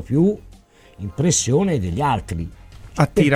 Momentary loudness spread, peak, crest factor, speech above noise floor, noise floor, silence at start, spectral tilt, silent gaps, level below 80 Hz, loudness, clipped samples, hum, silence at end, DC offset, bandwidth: 16 LU; -2 dBFS; 18 dB; 29 dB; -47 dBFS; 0 s; -5.5 dB/octave; none; -40 dBFS; -20 LUFS; under 0.1%; none; 0 s; under 0.1%; 15 kHz